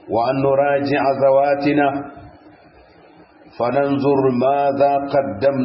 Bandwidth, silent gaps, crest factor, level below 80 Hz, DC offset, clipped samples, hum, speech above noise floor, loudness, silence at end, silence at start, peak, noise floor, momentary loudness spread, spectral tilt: 5.8 kHz; none; 14 dB; -56 dBFS; under 0.1%; under 0.1%; none; 31 dB; -17 LUFS; 0 s; 0.05 s; -4 dBFS; -47 dBFS; 6 LU; -11.5 dB/octave